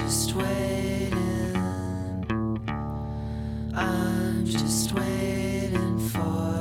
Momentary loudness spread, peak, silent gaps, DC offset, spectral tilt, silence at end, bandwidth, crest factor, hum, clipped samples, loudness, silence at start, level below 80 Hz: 7 LU; -12 dBFS; none; under 0.1%; -5 dB/octave; 0 s; 17 kHz; 14 dB; none; under 0.1%; -28 LUFS; 0 s; -40 dBFS